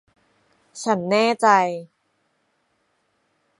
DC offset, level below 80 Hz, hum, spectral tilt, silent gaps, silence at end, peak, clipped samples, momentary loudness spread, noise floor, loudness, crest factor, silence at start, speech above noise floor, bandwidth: under 0.1%; -74 dBFS; none; -4.5 dB/octave; none; 1.75 s; -2 dBFS; under 0.1%; 17 LU; -69 dBFS; -19 LUFS; 22 dB; 0.75 s; 50 dB; 11.5 kHz